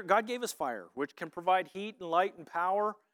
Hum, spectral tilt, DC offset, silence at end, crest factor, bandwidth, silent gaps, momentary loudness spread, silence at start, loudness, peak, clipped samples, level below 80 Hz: none; -3.5 dB/octave; under 0.1%; 0.2 s; 20 dB; 18 kHz; none; 9 LU; 0 s; -33 LUFS; -12 dBFS; under 0.1%; -84 dBFS